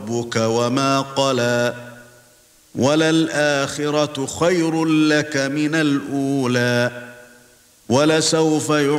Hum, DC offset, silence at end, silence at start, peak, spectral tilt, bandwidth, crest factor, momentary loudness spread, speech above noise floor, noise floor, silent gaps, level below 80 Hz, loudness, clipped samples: none; under 0.1%; 0 s; 0 s; -4 dBFS; -4.5 dB/octave; 15.5 kHz; 16 dB; 6 LU; 34 dB; -52 dBFS; none; -60 dBFS; -18 LUFS; under 0.1%